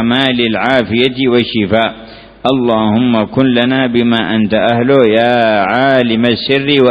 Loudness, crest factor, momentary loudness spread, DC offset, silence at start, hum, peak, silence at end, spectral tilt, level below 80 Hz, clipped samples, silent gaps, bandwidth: -11 LUFS; 12 dB; 4 LU; under 0.1%; 0 s; none; 0 dBFS; 0 s; -7.5 dB/octave; -44 dBFS; 0.2%; none; 5.2 kHz